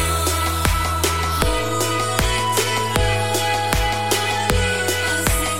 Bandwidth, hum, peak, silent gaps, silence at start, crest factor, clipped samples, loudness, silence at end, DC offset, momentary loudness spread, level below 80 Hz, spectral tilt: 17 kHz; none; -2 dBFS; none; 0 s; 18 dB; under 0.1%; -19 LUFS; 0 s; 1%; 1 LU; -28 dBFS; -3 dB/octave